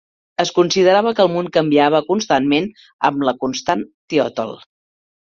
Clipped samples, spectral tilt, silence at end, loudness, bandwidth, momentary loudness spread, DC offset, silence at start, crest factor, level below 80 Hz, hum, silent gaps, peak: under 0.1%; -4.5 dB/octave; 0.75 s; -17 LUFS; 7.6 kHz; 9 LU; under 0.1%; 0.4 s; 16 dB; -58 dBFS; none; 2.93-2.99 s, 3.94-4.08 s; -2 dBFS